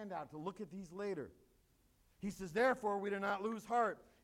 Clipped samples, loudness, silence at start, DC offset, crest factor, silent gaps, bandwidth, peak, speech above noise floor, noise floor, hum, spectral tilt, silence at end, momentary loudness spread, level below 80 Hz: under 0.1%; -40 LUFS; 0 s; under 0.1%; 18 dB; none; 16.5 kHz; -22 dBFS; 33 dB; -73 dBFS; none; -5.5 dB/octave; 0.2 s; 13 LU; -72 dBFS